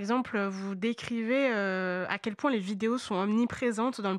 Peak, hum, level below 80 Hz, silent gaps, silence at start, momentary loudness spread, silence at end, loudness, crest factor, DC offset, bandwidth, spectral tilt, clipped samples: -14 dBFS; none; -70 dBFS; none; 0 s; 5 LU; 0 s; -30 LUFS; 16 dB; under 0.1%; 11.5 kHz; -5.5 dB/octave; under 0.1%